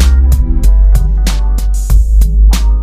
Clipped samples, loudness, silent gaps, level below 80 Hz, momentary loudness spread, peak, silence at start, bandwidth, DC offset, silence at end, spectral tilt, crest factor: 0.5%; -11 LUFS; none; -8 dBFS; 5 LU; 0 dBFS; 0 s; 14.5 kHz; under 0.1%; 0 s; -5.5 dB/octave; 6 dB